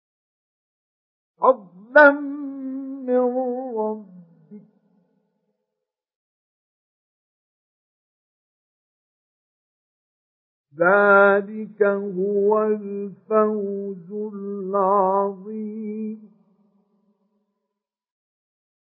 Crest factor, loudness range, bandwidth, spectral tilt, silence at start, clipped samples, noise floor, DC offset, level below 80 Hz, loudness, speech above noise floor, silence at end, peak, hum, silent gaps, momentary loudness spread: 24 dB; 13 LU; 5.8 kHz; -10.5 dB/octave; 1.4 s; under 0.1%; -84 dBFS; under 0.1%; -82 dBFS; -21 LUFS; 64 dB; 2.75 s; 0 dBFS; none; 6.16-10.64 s; 17 LU